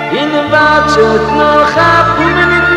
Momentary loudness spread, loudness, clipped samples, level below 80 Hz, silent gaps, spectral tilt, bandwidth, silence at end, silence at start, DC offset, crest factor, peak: 3 LU; -8 LUFS; 0.5%; -30 dBFS; none; -5 dB/octave; 13 kHz; 0 s; 0 s; under 0.1%; 8 dB; 0 dBFS